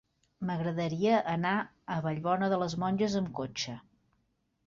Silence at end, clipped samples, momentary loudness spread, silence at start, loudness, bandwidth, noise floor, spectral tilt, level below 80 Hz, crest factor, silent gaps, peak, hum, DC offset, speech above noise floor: 0.85 s; under 0.1%; 9 LU; 0.4 s; -32 LUFS; 7.6 kHz; -76 dBFS; -6 dB/octave; -66 dBFS; 16 dB; none; -16 dBFS; none; under 0.1%; 45 dB